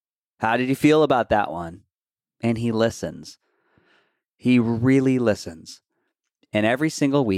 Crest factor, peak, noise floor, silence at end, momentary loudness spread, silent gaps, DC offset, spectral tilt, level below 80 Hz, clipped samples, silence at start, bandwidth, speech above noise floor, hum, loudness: 18 dB; -6 dBFS; under -90 dBFS; 0 s; 15 LU; none; under 0.1%; -6.5 dB/octave; -54 dBFS; under 0.1%; 0.4 s; 14.5 kHz; over 69 dB; none; -21 LUFS